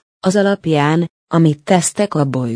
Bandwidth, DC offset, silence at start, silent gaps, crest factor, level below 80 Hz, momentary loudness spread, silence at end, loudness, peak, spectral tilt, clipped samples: 10.5 kHz; under 0.1%; 0.25 s; 1.10-1.27 s; 16 dB; -58 dBFS; 3 LU; 0 s; -15 LUFS; 0 dBFS; -5.5 dB/octave; under 0.1%